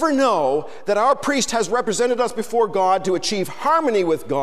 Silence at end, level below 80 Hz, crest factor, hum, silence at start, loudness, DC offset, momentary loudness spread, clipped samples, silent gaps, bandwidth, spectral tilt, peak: 0 s; -58 dBFS; 12 dB; none; 0 s; -20 LUFS; 1%; 4 LU; under 0.1%; none; 15.5 kHz; -3.5 dB/octave; -6 dBFS